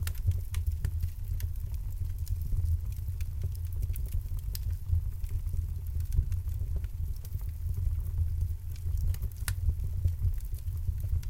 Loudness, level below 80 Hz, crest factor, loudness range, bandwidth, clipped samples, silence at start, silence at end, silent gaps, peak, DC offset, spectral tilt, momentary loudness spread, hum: -35 LUFS; -34 dBFS; 18 dB; 2 LU; 17 kHz; under 0.1%; 0 s; 0 s; none; -14 dBFS; under 0.1%; -6 dB/octave; 5 LU; none